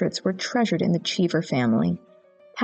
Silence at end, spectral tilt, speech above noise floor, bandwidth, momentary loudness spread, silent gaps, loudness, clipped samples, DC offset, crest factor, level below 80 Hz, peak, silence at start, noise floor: 0 s; -5.5 dB/octave; 27 dB; 8.6 kHz; 5 LU; none; -24 LUFS; under 0.1%; under 0.1%; 14 dB; -68 dBFS; -10 dBFS; 0 s; -51 dBFS